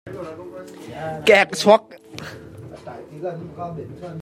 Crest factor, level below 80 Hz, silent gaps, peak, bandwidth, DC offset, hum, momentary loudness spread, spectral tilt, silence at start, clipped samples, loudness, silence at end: 22 dB; -60 dBFS; none; -2 dBFS; 15.5 kHz; under 0.1%; none; 23 LU; -4 dB/octave; 0.05 s; under 0.1%; -18 LUFS; 0 s